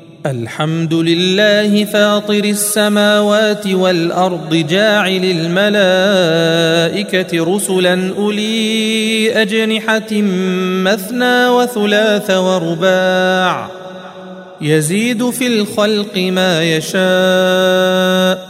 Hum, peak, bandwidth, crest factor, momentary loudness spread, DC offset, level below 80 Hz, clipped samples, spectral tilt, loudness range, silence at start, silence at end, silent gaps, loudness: none; 0 dBFS; 16 kHz; 12 dB; 5 LU; under 0.1%; -60 dBFS; under 0.1%; -4.5 dB/octave; 3 LU; 0.1 s; 0 s; none; -13 LUFS